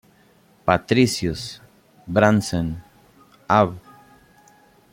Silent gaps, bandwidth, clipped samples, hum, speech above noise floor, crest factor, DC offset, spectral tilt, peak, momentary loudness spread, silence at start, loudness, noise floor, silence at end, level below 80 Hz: none; 16.5 kHz; under 0.1%; none; 36 dB; 20 dB; under 0.1%; -5.5 dB/octave; -2 dBFS; 18 LU; 0.65 s; -20 LUFS; -56 dBFS; 1.15 s; -50 dBFS